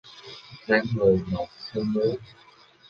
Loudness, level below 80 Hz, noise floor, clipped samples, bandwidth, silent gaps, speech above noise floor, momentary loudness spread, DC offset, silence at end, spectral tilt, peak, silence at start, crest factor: -25 LUFS; -52 dBFS; -45 dBFS; under 0.1%; 7 kHz; none; 20 dB; 20 LU; under 0.1%; 0.65 s; -7.5 dB/octave; -6 dBFS; 0.05 s; 20 dB